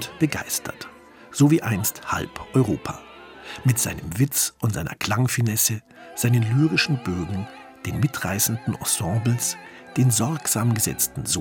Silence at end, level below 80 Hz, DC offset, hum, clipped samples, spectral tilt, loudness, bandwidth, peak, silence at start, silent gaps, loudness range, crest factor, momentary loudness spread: 0 s; -52 dBFS; under 0.1%; none; under 0.1%; -4.5 dB/octave; -23 LUFS; 17.5 kHz; -6 dBFS; 0 s; none; 2 LU; 18 dB; 15 LU